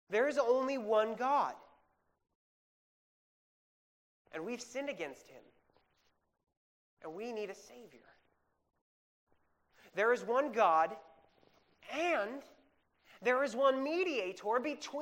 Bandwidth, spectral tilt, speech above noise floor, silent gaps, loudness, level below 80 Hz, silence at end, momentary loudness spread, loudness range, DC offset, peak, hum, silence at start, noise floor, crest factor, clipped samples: 16 kHz; -3.5 dB/octave; 43 dB; 2.35-4.25 s, 6.57-6.97 s, 8.81-9.27 s; -34 LUFS; -84 dBFS; 0 s; 15 LU; 15 LU; under 0.1%; -16 dBFS; none; 0.1 s; -78 dBFS; 20 dB; under 0.1%